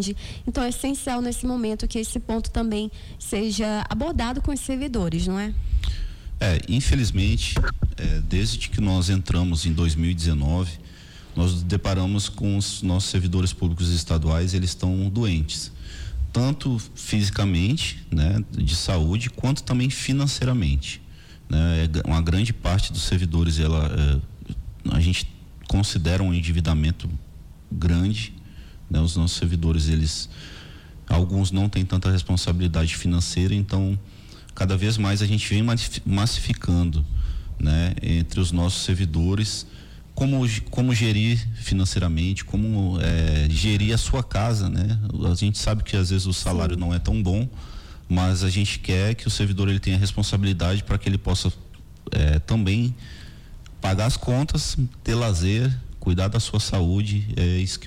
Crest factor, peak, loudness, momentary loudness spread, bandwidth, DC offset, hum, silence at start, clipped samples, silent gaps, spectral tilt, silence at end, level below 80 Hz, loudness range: 12 dB; -10 dBFS; -23 LUFS; 8 LU; 14.5 kHz; under 0.1%; none; 0 s; under 0.1%; none; -5.5 dB/octave; 0 s; -30 dBFS; 2 LU